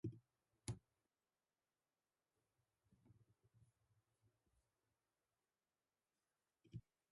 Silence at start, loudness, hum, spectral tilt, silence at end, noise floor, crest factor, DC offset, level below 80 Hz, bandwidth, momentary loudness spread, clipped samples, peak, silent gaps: 0.05 s; -57 LUFS; none; -6 dB/octave; 0.3 s; under -90 dBFS; 32 dB; under 0.1%; -78 dBFS; 10.5 kHz; 7 LU; under 0.1%; -30 dBFS; none